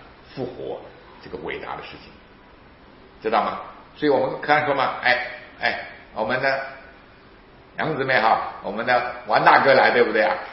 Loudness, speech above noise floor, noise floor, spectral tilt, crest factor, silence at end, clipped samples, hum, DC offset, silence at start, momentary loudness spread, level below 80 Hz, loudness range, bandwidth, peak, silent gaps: -21 LUFS; 27 dB; -48 dBFS; -7.5 dB/octave; 22 dB; 0 s; under 0.1%; none; under 0.1%; 0 s; 19 LU; -56 dBFS; 11 LU; 5.8 kHz; 0 dBFS; none